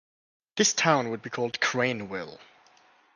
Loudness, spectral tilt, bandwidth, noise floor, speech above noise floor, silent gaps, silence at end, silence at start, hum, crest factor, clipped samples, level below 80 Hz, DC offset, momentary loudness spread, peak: -26 LUFS; -2.5 dB/octave; 11 kHz; -60 dBFS; 33 dB; none; 0.7 s; 0.55 s; none; 22 dB; under 0.1%; -72 dBFS; under 0.1%; 15 LU; -6 dBFS